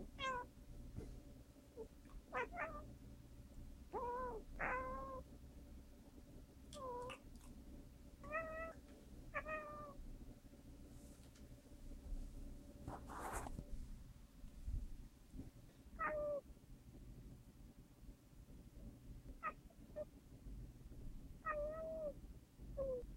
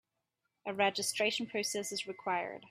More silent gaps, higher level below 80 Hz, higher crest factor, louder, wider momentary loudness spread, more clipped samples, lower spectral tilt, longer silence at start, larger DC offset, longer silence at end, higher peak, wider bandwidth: neither; first, -56 dBFS vs -82 dBFS; about the same, 20 dB vs 22 dB; second, -51 LUFS vs -34 LUFS; first, 17 LU vs 7 LU; neither; first, -5.5 dB/octave vs -2 dB/octave; second, 0 s vs 0.65 s; neither; about the same, 0 s vs 0 s; second, -30 dBFS vs -16 dBFS; about the same, 16 kHz vs 15.5 kHz